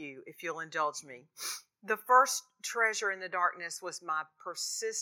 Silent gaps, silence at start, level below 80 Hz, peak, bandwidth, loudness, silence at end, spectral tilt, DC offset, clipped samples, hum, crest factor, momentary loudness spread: none; 0 s; under -90 dBFS; -12 dBFS; 19 kHz; -32 LUFS; 0 s; -0.5 dB/octave; under 0.1%; under 0.1%; none; 20 dB; 17 LU